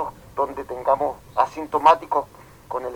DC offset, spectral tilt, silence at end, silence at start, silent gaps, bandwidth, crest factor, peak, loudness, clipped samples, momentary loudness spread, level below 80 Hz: under 0.1%; -5 dB/octave; 0 s; 0 s; none; 19 kHz; 18 dB; -4 dBFS; -22 LUFS; under 0.1%; 14 LU; -54 dBFS